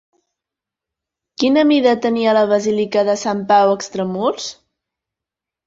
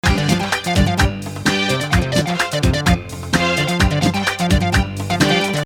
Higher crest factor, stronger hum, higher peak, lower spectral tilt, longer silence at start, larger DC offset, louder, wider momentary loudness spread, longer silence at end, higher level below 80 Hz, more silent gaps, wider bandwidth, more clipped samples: about the same, 16 dB vs 16 dB; neither; about the same, -2 dBFS vs 0 dBFS; about the same, -5 dB/octave vs -4.5 dB/octave; first, 1.4 s vs 0.05 s; neither; about the same, -16 LUFS vs -17 LUFS; first, 8 LU vs 4 LU; first, 1.15 s vs 0 s; second, -62 dBFS vs -26 dBFS; neither; second, 7.8 kHz vs 18.5 kHz; neither